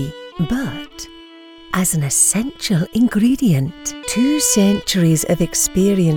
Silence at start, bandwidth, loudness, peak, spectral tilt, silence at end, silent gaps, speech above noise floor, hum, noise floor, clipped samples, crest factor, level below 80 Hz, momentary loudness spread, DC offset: 0 s; 19.5 kHz; -16 LUFS; -2 dBFS; -4.5 dB/octave; 0 s; none; 24 dB; none; -40 dBFS; under 0.1%; 14 dB; -40 dBFS; 13 LU; under 0.1%